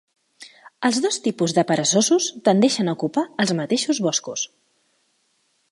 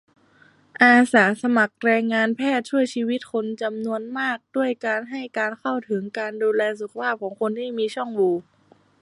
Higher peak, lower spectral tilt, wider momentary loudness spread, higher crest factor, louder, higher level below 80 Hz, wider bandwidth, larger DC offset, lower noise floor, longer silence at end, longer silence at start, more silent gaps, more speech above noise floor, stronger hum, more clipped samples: about the same, -4 dBFS vs -2 dBFS; second, -3.5 dB/octave vs -5 dB/octave; second, 7 LU vs 11 LU; about the same, 18 dB vs 20 dB; about the same, -21 LUFS vs -22 LUFS; about the same, -70 dBFS vs -74 dBFS; about the same, 11.5 kHz vs 11.5 kHz; neither; first, -67 dBFS vs -56 dBFS; first, 1.25 s vs 0.6 s; second, 0.4 s vs 0.8 s; neither; first, 47 dB vs 34 dB; neither; neither